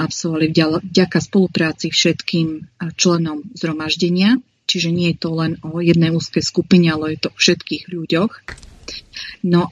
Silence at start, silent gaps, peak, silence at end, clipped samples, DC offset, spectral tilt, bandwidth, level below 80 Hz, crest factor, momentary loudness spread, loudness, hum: 0 s; none; 0 dBFS; 0 s; under 0.1%; under 0.1%; -5 dB/octave; 10 kHz; -50 dBFS; 18 dB; 12 LU; -17 LUFS; none